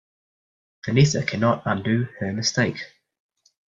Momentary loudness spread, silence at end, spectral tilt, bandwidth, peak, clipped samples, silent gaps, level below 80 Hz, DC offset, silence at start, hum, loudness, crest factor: 14 LU; 0.8 s; -5 dB/octave; 7.6 kHz; -6 dBFS; under 0.1%; none; -54 dBFS; under 0.1%; 0.85 s; none; -22 LUFS; 18 dB